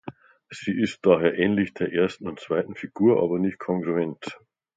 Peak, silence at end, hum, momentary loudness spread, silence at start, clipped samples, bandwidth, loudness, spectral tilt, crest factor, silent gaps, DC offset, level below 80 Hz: -4 dBFS; 0.4 s; none; 15 LU; 0.05 s; under 0.1%; 9 kHz; -24 LUFS; -7 dB/octave; 20 dB; none; under 0.1%; -60 dBFS